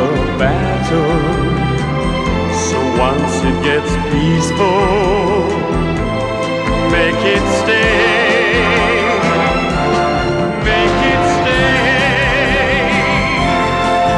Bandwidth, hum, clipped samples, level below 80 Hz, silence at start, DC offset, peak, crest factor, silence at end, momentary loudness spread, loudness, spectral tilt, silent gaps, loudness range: 11.5 kHz; none; under 0.1%; -26 dBFS; 0 s; under 0.1%; 0 dBFS; 12 dB; 0 s; 5 LU; -13 LUFS; -5 dB/octave; none; 3 LU